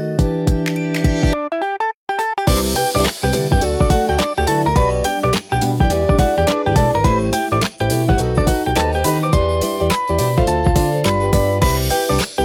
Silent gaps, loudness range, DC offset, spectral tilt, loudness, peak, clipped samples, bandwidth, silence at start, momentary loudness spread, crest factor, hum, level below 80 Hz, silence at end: 1.94-2.07 s; 1 LU; under 0.1%; -5.5 dB/octave; -17 LUFS; -2 dBFS; under 0.1%; 17.5 kHz; 0 s; 3 LU; 14 dB; none; -24 dBFS; 0 s